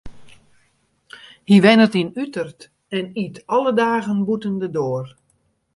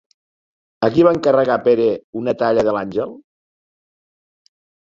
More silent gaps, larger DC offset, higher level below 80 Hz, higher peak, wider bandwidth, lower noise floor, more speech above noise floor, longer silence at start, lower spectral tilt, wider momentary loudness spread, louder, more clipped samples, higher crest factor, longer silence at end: second, none vs 2.04-2.13 s; neither; about the same, -56 dBFS vs -56 dBFS; about the same, 0 dBFS vs -2 dBFS; first, 11.5 kHz vs 7.6 kHz; second, -65 dBFS vs under -90 dBFS; second, 47 dB vs over 74 dB; second, 0.05 s vs 0.8 s; about the same, -6.5 dB/octave vs -7.5 dB/octave; first, 16 LU vs 10 LU; about the same, -19 LUFS vs -17 LUFS; neither; about the same, 20 dB vs 18 dB; second, 0.65 s vs 1.7 s